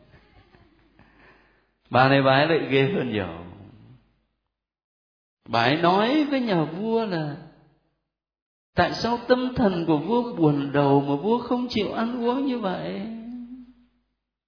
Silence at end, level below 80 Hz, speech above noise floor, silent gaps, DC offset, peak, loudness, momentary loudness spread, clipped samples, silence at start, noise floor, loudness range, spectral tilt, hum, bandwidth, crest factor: 0.85 s; -56 dBFS; 60 dB; 4.84-5.37 s, 8.42-8.73 s; under 0.1%; -2 dBFS; -23 LUFS; 14 LU; under 0.1%; 1.9 s; -82 dBFS; 4 LU; -7.5 dB/octave; none; 5.4 kHz; 22 dB